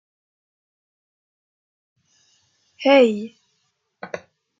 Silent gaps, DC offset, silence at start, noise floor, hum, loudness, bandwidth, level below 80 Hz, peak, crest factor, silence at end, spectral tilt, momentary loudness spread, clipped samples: none; under 0.1%; 2.8 s; -71 dBFS; none; -17 LUFS; 7.6 kHz; -78 dBFS; -2 dBFS; 22 dB; 0.4 s; -5 dB/octave; 23 LU; under 0.1%